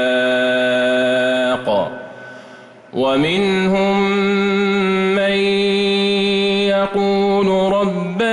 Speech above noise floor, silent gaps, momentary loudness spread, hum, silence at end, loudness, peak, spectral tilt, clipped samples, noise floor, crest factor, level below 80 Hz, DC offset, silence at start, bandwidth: 25 dB; none; 4 LU; none; 0 s; -16 LUFS; -8 dBFS; -5.5 dB/octave; under 0.1%; -40 dBFS; 10 dB; -52 dBFS; under 0.1%; 0 s; 11.5 kHz